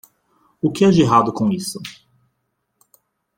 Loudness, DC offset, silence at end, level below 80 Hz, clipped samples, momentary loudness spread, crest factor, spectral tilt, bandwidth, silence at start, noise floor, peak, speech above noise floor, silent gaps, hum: -17 LUFS; under 0.1%; 1.45 s; -54 dBFS; under 0.1%; 17 LU; 18 dB; -6.5 dB/octave; 16.5 kHz; 0.65 s; -72 dBFS; -2 dBFS; 56 dB; none; none